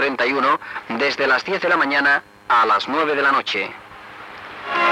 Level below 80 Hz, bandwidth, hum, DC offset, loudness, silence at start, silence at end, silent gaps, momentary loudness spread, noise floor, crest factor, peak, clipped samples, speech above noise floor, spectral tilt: -64 dBFS; 15 kHz; none; under 0.1%; -18 LUFS; 0 s; 0 s; none; 19 LU; -38 dBFS; 12 dB; -8 dBFS; under 0.1%; 19 dB; -3.5 dB/octave